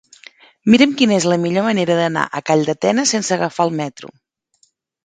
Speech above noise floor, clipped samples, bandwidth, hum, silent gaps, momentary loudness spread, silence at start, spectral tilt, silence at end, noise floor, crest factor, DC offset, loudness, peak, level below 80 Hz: 45 dB; under 0.1%; 9.4 kHz; none; none; 8 LU; 0.65 s; -4.5 dB/octave; 0.95 s; -61 dBFS; 18 dB; under 0.1%; -16 LUFS; 0 dBFS; -60 dBFS